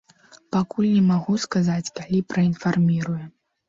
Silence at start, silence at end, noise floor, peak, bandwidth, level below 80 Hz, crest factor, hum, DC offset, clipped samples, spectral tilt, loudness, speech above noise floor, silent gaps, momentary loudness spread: 0.55 s; 0.4 s; -53 dBFS; -10 dBFS; 7.6 kHz; -58 dBFS; 12 dB; none; under 0.1%; under 0.1%; -6.5 dB/octave; -22 LUFS; 32 dB; none; 8 LU